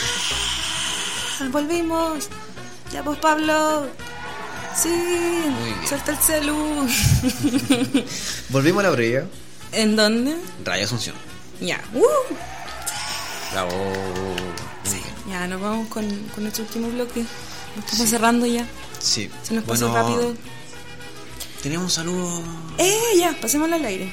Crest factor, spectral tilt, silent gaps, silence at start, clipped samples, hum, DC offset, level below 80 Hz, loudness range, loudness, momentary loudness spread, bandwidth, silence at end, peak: 18 dB; -3.5 dB/octave; none; 0 s; under 0.1%; none; 1%; -44 dBFS; 6 LU; -22 LUFS; 15 LU; 16.5 kHz; 0 s; -4 dBFS